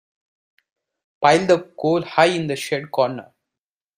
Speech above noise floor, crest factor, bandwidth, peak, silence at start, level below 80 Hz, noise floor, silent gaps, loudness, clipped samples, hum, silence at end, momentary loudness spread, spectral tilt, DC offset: 69 dB; 20 dB; 16 kHz; 0 dBFS; 1.2 s; -64 dBFS; -88 dBFS; none; -19 LUFS; under 0.1%; none; 0.75 s; 7 LU; -5 dB/octave; under 0.1%